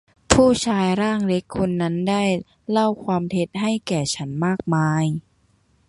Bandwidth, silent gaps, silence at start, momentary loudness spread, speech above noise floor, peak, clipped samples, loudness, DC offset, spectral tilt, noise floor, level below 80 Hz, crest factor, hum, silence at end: 11.5 kHz; none; 0.3 s; 7 LU; 41 dB; 0 dBFS; under 0.1%; -21 LUFS; under 0.1%; -5.5 dB/octave; -61 dBFS; -44 dBFS; 22 dB; none; 0.7 s